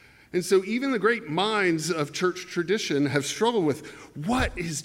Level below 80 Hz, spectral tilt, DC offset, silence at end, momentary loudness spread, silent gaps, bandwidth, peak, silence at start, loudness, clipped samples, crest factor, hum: -46 dBFS; -4.5 dB/octave; under 0.1%; 0 s; 7 LU; none; 16.5 kHz; -8 dBFS; 0.35 s; -26 LUFS; under 0.1%; 18 dB; none